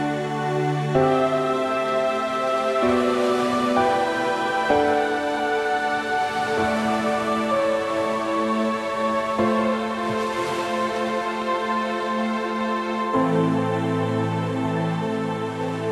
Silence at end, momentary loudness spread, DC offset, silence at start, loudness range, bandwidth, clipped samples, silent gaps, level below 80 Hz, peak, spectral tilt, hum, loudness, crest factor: 0 s; 5 LU; under 0.1%; 0 s; 3 LU; 14 kHz; under 0.1%; none; -56 dBFS; -6 dBFS; -6 dB/octave; none; -23 LUFS; 16 dB